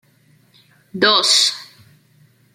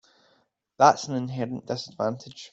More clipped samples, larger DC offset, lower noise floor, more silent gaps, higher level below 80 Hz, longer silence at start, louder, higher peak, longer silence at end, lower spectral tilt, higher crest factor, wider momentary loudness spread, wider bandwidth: neither; neither; second, -55 dBFS vs -68 dBFS; neither; about the same, -72 dBFS vs -68 dBFS; first, 0.95 s vs 0.8 s; first, -13 LUFS vs -25 LUFS; first, 0 dBFS vs -4 dBFS; first, 0.9 s vs 0.05 s; second, -0.5 dB/octave vs -5 dB/octave; about the same, 20 dB vs 24 dB; first, 22 LU vs 13 LU; first, 16.5 kHz vs 8.2 kHz